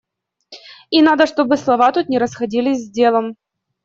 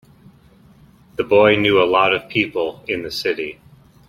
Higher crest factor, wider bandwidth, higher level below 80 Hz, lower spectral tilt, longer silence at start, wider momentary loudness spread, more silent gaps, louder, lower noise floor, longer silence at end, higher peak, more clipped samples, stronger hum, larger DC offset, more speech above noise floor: about the same, 14 dB vs 18 dB; second, 7.6 kHz vs 15 kHz; second, -60 dBFS vs -54 dBFS; about the same, -4.5 dB/octave vs -5.5 dB/octave; second, 0.5 s vs 1.2 s; second, 7 LU vs 13 LU; neither; about the same, -16 LUFS vs -17 LUFS; about the same, -50 dBFS vs -49 dBFS; about the same, 0.5 s vs 0.55 s; about the same, -2 dBFS vs 0 dBFS; neither; neither; neither; about the same, 35 dB vs 32 dB